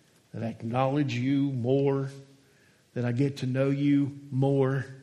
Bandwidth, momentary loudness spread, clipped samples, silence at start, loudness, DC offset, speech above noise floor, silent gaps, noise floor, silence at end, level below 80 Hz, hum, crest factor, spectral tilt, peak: 10 kHz; 11 LU; under 0.1%; 0.35 s; -28 LUFS; under 0.1%; 35 dB; none; -62 dBFS; 0 s; -70 dBFS; none; 16 dB; -8.5 dB/octave; -12 dBFS